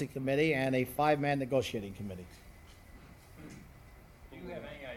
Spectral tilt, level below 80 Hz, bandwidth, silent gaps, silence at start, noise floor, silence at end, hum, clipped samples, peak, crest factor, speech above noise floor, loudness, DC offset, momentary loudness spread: -6 dB/octave; -58 dBFS; 18 kHz; none; 0 s; -55 dBFS; 0 s; none; under 0.1%; -14 dBFS; 20 dB; 23 dB; -32 LUFS; under 0.1%; 24 LU